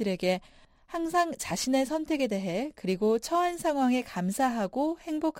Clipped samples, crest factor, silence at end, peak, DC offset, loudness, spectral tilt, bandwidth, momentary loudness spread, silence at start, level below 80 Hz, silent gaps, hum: under 0.1%; 14 dB; 0 s; -14 dBFS; under 0.1%; -29 LUFS; -5 dB/octave; 16 kHz; 6 LU; 0 s; -60 dBFS; none; none